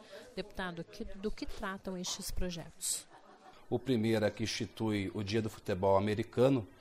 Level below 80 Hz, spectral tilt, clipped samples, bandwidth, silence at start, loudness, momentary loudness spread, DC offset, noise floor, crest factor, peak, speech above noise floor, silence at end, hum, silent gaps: -50 dBFS; -5 dB/octave; under 0.1%; 15.5 kHz; 0 s; -35 LUFS; 12 LU; under 0.1%; -57 dBFS; 18 dB; -16 dBFS; 23 dB; 0.05 s; none; none